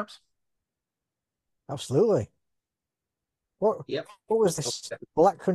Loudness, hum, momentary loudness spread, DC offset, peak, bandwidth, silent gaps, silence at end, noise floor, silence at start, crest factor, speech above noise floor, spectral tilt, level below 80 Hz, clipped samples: -27 LUFS; none; 14 LU; under 0.1%; -10 dBFS; 12.5 kHz; none; 0 s; -89 dBFS; 0 s; 20 dB; 63 dB; -5.5 dB/octave; -68 dBFS; under 0.1%